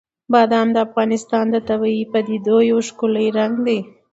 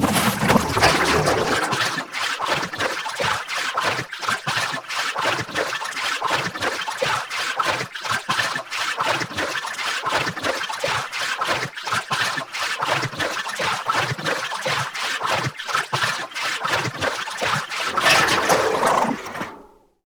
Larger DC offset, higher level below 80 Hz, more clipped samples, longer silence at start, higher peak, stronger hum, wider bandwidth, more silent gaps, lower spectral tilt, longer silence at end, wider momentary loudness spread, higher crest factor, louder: neither; second, -60 dBFS vs -50 dBFS; neither; first, 0.3 s vs 0 s; about the same, -2 dBFS vs 0 dBFS; neither; second, 8 kHz vs over 20 kHz; neither; first, -5.5 dB/octave vs -2.5 dB/octave; second, 0.25 s vs 0.45 s; about the same, 5 LU vs 7 LU; second, 16 dB vs 22 dB; first, -18 LUFS vs -22 LUFS